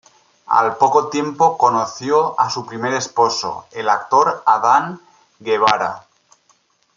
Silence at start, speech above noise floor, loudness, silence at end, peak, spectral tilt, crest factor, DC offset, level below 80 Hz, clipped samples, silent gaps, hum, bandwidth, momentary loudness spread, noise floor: 0.5 s; 43 dB; -17 LUFS; 0.95 s; -2 dBFS; -3.5 dB/octave; 16 dB; under 0.1%; -66 dBFS; under 0.1%; none; none; 7.6 kHz; 10 LU; -59 dBFS